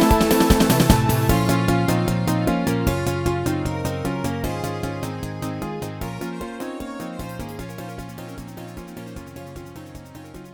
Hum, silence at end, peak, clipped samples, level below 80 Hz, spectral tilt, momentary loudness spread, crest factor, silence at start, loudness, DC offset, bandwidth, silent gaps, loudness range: none; 0 s; 0 dBFS; under 0.1%; -34 dBFS; -5.5 dB/octave; 20 LU; 22 dB; 0 s; -22 LUFS; under 0.1%; over 20 kHz; none; 15 LU